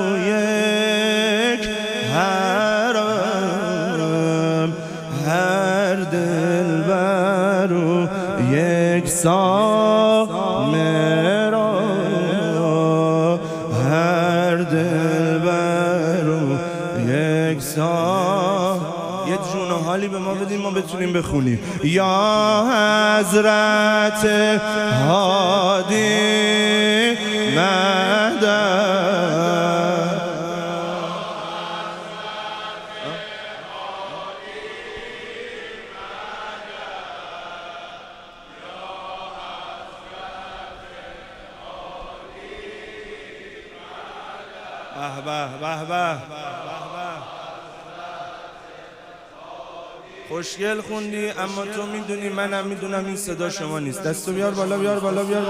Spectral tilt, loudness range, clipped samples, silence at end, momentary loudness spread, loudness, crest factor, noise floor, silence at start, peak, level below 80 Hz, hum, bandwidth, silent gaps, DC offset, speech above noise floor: -5 dB/octave; 18 LU; under 0.1%; 0 s; 20 LU; -19 LUFS; 16 dB; -42 dBFS; 0 s; -4 dBFS; -54 dBFS; none; 15.5 kHz; none; under 0.1%; 23 dB